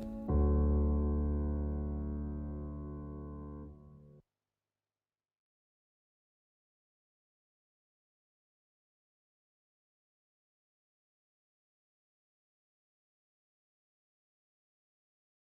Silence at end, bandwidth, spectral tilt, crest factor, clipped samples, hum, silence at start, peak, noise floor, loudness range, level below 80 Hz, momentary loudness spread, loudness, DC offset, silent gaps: 11.35 s; 1.7 kHz; -12.5 dB/octave; 18 dB; under 0.1%; none; 0 s; -22 dBFS; under -90 dBFS; 19 LU; -44 dBFS; 16 LU; -36 LUFS; under 0.1%; none